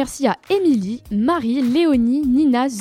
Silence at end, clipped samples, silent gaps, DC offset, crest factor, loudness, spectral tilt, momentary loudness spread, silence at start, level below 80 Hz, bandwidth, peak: 0 s; under 0.1%; none; under 0.1%; 14 dB; -18 LUFS; -5.5 dB/octave; 5 LU; 0 s; -46 dBFS; 14.5 kHz; -2 dBFS